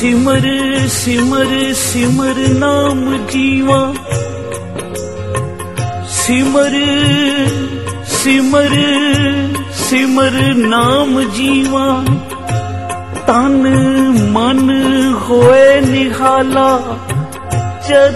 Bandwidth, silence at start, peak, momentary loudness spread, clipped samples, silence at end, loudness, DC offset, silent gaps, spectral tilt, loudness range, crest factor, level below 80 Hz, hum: 13 kHz; 0 s; 0 dBFS; 10 LU; under 0.1%; 0 s; -12 LUFS; 1%; none; -5 dB/octave; 5 LU; 12 dB; -38 dBFS; none